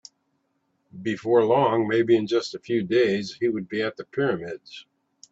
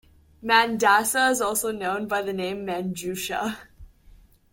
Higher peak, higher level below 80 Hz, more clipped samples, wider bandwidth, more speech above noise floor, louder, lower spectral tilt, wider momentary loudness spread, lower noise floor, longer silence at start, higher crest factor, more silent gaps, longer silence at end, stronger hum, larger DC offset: about the same, -6 dBFS vs -4 dBFS; second, -68 dBFS vs -56 dBFS; neither; second, 8 kHz vs 17 kHz; first, 49 dB vs 29 dB; about the same, -24 LUFS vs -23 LUFS; first, -6 dB/octave vs -2.5 dB/octave; about the same, 13 LU vs 11 LU; first, -72 dBFS vs -53 dBFS; first, 0.95 s vs 0.4 s; about the same, 18 dB vs 22 dB; neither; second, 0.5 s vs 0.65 s; neither; neither